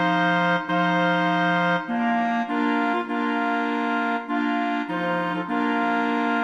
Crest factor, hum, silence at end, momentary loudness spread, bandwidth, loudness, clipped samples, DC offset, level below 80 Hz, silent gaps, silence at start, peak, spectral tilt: 12 dB; none; 0 s; 4 LU; 9.2 kHz; -23 LUFS; under 0.1%; under 0.1%; -68 dBFS; none; 0 s; -10 dBFS; -6.5 dB/octave